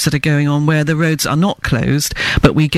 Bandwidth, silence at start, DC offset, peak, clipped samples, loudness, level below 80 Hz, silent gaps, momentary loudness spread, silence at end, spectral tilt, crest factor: 15.5 kHz; 0 s; under 0.1%; 0 dBFS; 0.1%; -14 LUFS; -30 dBFS; none; 3 LU; 0 s; -5 dB/octave; 14 dB